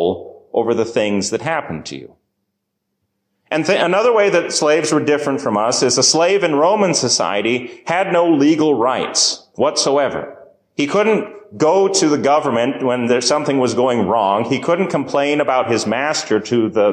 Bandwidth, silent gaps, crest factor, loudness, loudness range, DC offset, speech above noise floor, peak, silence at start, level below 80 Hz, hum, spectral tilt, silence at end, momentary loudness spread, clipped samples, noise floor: 14.5 kHz; none; 14 dB; -16 LUFS; 4 LU; under 0.1%; 58 dB; -2 dBFS; 0 s; -58 dBFS; none; -3.5 dB/octave; 0 s; 8 LU; under 0.1%; -74 dBFS